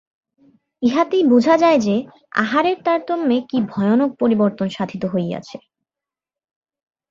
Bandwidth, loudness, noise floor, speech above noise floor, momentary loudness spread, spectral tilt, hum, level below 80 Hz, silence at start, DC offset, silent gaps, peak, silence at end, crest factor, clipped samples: 7.4 kHz; -18 LUFS; -88 dBFS; 71 dB; 10 LU; -6.5 dB/octave; none; -62 dBFS; 0.8 s; under 0.1%; none; -2 dBFS; 1.55 s; 18 dB; under 0.1%